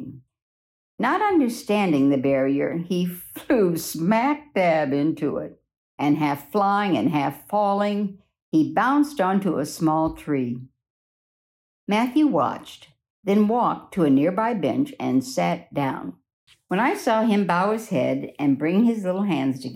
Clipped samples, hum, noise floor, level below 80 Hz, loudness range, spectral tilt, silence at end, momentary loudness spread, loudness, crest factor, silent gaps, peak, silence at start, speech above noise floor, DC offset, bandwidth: under 0.1%; none; under -90 dBFS; -60 dBFS; 3 LU; -6.5 dB/octave; 0 s; 8 LU; -22 LUFS; 14 dB; 0.42-0.98 s, 5.77-5.98 s, 8.42-8.52 s, 10.90-11.87 s, 13.10-13.23 s, 16.33-16.47 s; -8 dBFS; 0 s; over 68 dB; under 0.1%; 16 kHz